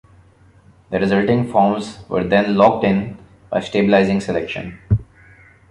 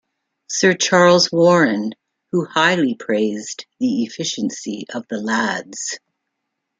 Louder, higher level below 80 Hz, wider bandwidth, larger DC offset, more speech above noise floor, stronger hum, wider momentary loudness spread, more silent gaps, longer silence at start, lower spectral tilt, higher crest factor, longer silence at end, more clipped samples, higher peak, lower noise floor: about the same, -18 LUFS vs -18 LUFS; first, -40 dBFS vs -66 dBFS; first, 10.5 kHz vs 9.4 kHz; neither; second, 33 dB vs 59 dB; neither; second, 11 LU vs 14 LU; neither; first, 0.9 s vs 0.5 s; first, -7.5 dB/octave vs -4 dB/octave; about the same, 18 dB vs 18 dB; second, 0.7 s vs 0.85 s; neither; about the same, -2 dBFS vs -2 dBFS; second, -49 dBFS vs -77 dBFS